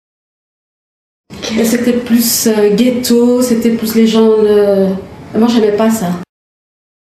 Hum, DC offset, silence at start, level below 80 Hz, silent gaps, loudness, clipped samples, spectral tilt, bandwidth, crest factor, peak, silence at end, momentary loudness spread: none; under 0.1%; 1.3 s; -48 dBFS; none; -11 LUFS; under 0.1%; -4.5 dB/octave; 15.5 kHz; 12 dB; 0 dBFS; 0.95 s; 10 LU